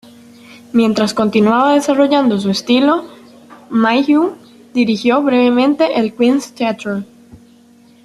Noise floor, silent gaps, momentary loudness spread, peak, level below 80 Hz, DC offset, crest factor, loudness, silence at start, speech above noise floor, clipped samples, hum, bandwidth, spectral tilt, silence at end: -46 dBFS; none; 8 LU; 0 dBFS; -58 dBFS; under 0.1%; 14 dB; -14 LUFS; 0.75 s; 33 dB; under 0.1%; none; 12.5 kHz; -5.5 dB/octave; 0.7 s